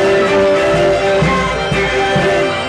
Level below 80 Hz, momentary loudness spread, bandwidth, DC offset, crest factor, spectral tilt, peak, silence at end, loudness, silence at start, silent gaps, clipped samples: -32 dBFS; 3 LU; 11.5 kHz; under 0.1%; 10 dB; -5 dB/octave; -2 dBFS; 0 s; -13 LUFS; 0 s; none; under 0.1%